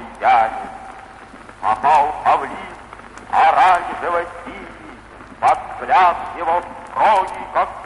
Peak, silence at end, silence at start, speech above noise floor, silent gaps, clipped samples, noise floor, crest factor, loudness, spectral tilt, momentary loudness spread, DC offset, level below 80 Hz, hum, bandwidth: -2 dBFS; 0 s; 0 s; 22 dB; none; under 0.1%; -39 dBFS; 16 dB; -17 LUFS; -4 dB/octave; 22 LU; under 0.1%; -48 dBFS; none; 11.5 kHz